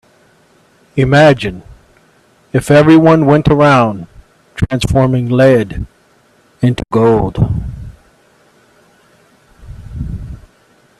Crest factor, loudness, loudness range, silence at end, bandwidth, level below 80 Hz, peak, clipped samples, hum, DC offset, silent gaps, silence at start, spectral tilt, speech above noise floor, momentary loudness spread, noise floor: 14 dB; -11 LUFS; 11 LU; 0.65 s; 13 kHz; -32 dBFS; 0 dBFS; under 0.1%; none; under 0.1%; none; 0.95 s; -7.5 dB/octave; 41 dB; 21 LU; -51 dBFS